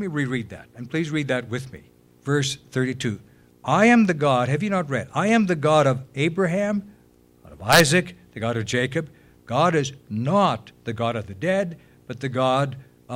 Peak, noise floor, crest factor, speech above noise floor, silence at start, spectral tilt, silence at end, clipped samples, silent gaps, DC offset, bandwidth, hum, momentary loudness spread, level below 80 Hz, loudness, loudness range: -4 dBFS; -55 dBFS; 20 dB; 33 dB; 0 s; -5 dB/octave; 0 s; under 0.1%; none; under 0.1%; 16 kHz; none; 15 LU; -56 dBFS; -22 LUFS; 5 LU